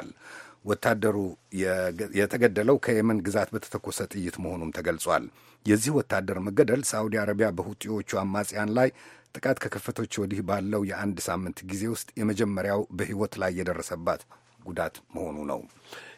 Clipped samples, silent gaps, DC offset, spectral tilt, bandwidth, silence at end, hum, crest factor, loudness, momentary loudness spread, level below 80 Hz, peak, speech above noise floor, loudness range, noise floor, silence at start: under 0.1%; none; under 0.1%; -5 dB/octave; 16 kHz; 0.05 s; none; 24 dB; -28 LUFS; 11 LU; -62 dBFS; -6 dBFS; 20 dB; 4 LU; -48 dBFS; 0 s